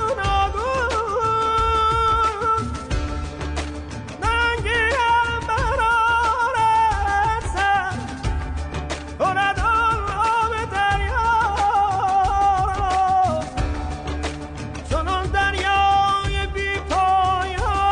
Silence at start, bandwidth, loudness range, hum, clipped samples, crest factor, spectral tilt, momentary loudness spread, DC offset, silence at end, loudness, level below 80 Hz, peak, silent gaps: 0 s; 10 kHz; 3 LU; none; under 0.1%; 10 dB; -4.5 dB/octave; 10 LU; under 0.1%; 0 s; -20 LUFS; -30 dBFS; -10 dBFS; none